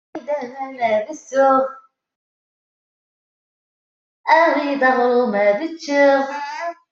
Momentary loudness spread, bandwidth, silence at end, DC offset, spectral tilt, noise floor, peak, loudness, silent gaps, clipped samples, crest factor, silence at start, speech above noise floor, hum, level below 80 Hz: 12 LU; 7.6 kHz; 0.2 s; under 0.1%; -4.5 dB/octave; under -90 dBFS; -2 dBFS; -18 LUFS; 2.16-4.24 s; under 0.1%; 16 dB; 0.15 s; over 73 dB; none; -74 dBFS